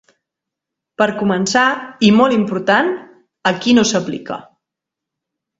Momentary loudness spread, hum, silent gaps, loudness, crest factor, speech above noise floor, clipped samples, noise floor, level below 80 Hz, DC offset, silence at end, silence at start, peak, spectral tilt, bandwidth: 13 LU; none; none; -15 LUFS; 18 dB; 68 dB; under 0.1%; -83 dBFS; -56 dBFS; under 0.1%; 1.15 s; 1 s; 0 dBFS; -4.5 dB/octave; 7.8 kHz